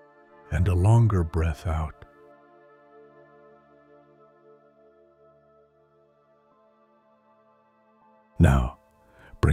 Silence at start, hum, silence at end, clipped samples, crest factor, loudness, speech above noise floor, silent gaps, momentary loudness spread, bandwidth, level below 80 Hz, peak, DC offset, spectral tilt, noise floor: 0.5 s; none; 0 s; under 0.1%; 22 dB; -24 LUFS; 41 dB; none; 13 LU; 11.5 kHz; -36 dBFS; -6 dBFS; under 0.1%; -8 dB/octave; -62 dBFS